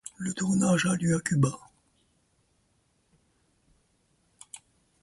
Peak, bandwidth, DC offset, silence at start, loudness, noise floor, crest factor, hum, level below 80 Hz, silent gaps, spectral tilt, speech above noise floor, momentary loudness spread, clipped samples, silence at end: -12 dBFS; 11.5 kHz; under 0.1%; 0.2 s; -26 LUFS; -70 dBFS; 20 dB; none; -62 dBFS; none; -5.5 dB/octave; 45 dB; 23 LU; under 0.1%; 0.45 s